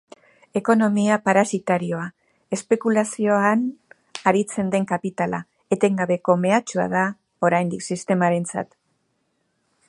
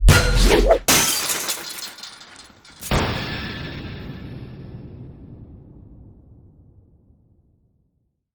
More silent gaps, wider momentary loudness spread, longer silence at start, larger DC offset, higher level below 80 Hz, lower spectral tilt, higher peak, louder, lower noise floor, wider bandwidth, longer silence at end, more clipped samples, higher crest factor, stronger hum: neither; second, 11 LU vs 25 LU; first, 0.55 s vs 0 s; neither; second, -66 dBFS vs -26 dBFS; first, -6 dB/octave vs -3.5 dB/octave; about the same, -2 dBFS vs -2 dBFS; second, -22 LUFS vs -19 LUFS; about the same, -70 dBFS vs -69 dBFS; second, 11.5 kHz vs over 20 kHz; second, 1.25 s vs 2.4 s; neither; about the same, 20 dB vs 22 dB; neither